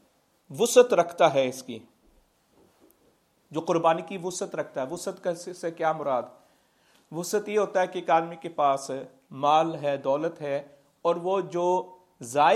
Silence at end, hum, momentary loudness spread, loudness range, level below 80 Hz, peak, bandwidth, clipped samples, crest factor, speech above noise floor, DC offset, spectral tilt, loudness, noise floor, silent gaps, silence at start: 0 s; none; 14 LU; 5 LU; -76 dBFS; -4 dBFS; 15.5 kHz; under 0.1%; 22 dB; 40 dB; under 0.1%; -4 dB/octave; -26 LUFS; -65 dBFS; none; 0.5 s